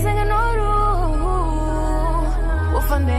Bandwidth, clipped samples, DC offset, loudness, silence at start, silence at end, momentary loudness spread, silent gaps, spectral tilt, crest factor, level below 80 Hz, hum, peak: 14.5 kHz; under 0.1%; under 0.1%; -21 LUFS; 0 s; 0 s; 3 LU; none; -7 dB/octave; 10 dB; -20 dBFS; none; -8 dBFS